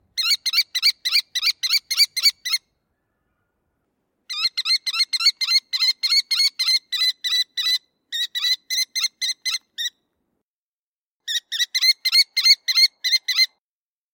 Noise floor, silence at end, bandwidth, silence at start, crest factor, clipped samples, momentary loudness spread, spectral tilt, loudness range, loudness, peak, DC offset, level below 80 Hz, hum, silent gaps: under -90 dBFS; 0.7 s; 17 kHz; 0.15 s; 20 dB; under 0.1%; 10 LU; 7 dB/octave; 6 LU; -18 LUFS; -4 dBFS; under 0.1%; -82 dBFS; none; 10.42-11.20 s